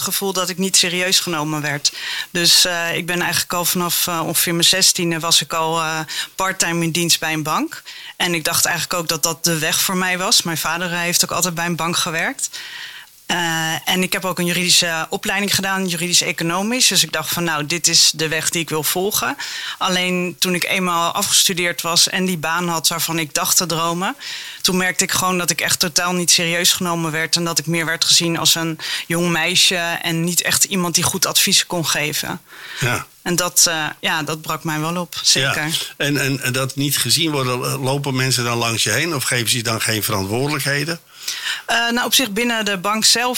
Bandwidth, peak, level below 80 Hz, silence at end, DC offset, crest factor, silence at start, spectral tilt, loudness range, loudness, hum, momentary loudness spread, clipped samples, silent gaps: 17.5 kHz; -2 dBFS; -54 dBFS; 0 s; 0.2%; 18 dB; 0 s; -2 dB/octave; 3 LU; -17 LUFS; none; 9 LU; under 0.1%; none